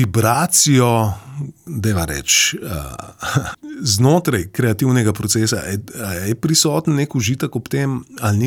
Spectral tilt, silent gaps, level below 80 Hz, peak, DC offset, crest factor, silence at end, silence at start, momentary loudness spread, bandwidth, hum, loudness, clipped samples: -4 dB/octave; none; -42 dBFS; -2 dBFS; under 0.1%; 14 dB; 0 s; 0 s; 14 LU; 18 kHz; none; -17 LUFS; under 0.1%